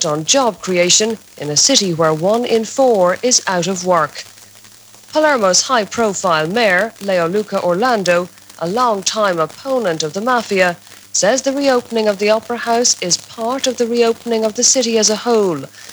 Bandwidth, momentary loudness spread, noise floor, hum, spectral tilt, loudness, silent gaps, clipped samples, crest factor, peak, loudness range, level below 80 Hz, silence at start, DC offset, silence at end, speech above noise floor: over 20 kHz; 7 LU; -42 dBFS; none; -2.5 dB/octave; -15 LUFS; none; under 0.1%; 14 dB; -2 dBFS; 3 LU; -62 dBFS; 0 s; under 0.1%; 0 s; 27 dB